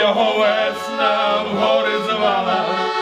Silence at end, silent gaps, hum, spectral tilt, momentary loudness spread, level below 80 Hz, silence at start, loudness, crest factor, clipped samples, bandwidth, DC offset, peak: 0 s; none; none; -4 dB/octave; 4 LU; -64 dBFS; 0 s; -17 LUFS; 14 dB; under 0.1%; 14 kHz; under 0.1%; -4 dBFS